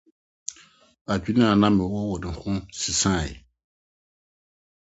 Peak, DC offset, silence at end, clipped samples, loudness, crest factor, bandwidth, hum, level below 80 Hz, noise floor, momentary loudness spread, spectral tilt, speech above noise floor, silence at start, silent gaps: -4 dBFS; under 0.1%; 1.5 s; under 0.1%; -23 LUFS; 22 dB; 8.2 kHz; none; -44 dBFS; -54 dBFS; 18 LU; -4.5 dB/octave; 31 dB; 0.5 s; 1.01-1.05 s